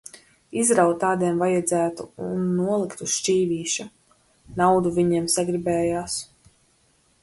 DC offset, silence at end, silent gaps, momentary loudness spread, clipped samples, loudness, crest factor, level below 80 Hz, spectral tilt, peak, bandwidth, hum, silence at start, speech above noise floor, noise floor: under 0.1%; 1 s; none; 12 LU; under 0.1%; -23 LUFS; 18 dB; -56 dBFS; -4.5 dB/octave; -6 dBFS; 12 kHz; none; 0.15 s; 40 dB; -63 dBFS